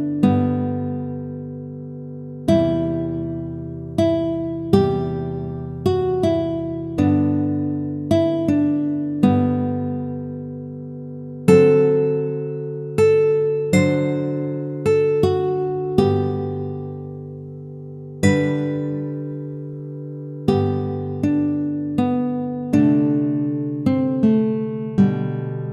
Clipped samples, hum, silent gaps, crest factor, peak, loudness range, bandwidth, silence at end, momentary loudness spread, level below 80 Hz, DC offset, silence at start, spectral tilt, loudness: under 0.1%; none; none; 20 dB; 0 dBFS; 5 LU; 13 kHz; 0 s; 15 LU; -48 dBFS; under 0.1%; 0 s; -8 dB/octave; -20 LUFS